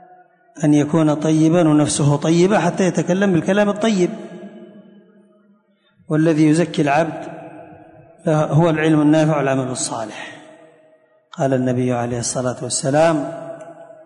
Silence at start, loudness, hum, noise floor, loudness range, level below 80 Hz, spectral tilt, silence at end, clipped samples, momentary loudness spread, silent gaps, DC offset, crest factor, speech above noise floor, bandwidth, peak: 0.55 s; -17 LUFS; none; -57 dBFS; 5 LU; -56 dBFS; -6 dB/octave; 0.2 s; under 0.1%; 18 LU; none; under 0.1%; 14 dB; 41 dB; 11 kHz; -4 dBFS